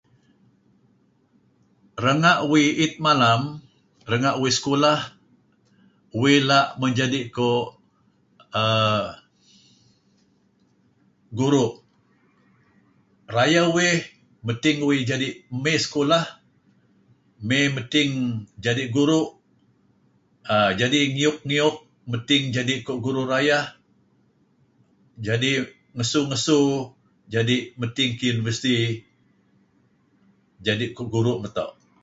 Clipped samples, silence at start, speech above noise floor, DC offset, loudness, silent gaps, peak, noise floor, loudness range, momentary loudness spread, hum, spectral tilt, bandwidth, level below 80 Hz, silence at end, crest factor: under 0.1%; 1.95 s; 41 dB; under 0.1%; -22 LUFS; none; -4 dBFS; -63 dBFS; 6 LU; 14 LU; none; -4.5 dB/octave; 8 kHz; -60 dBFS; 0.35 s; 20 dB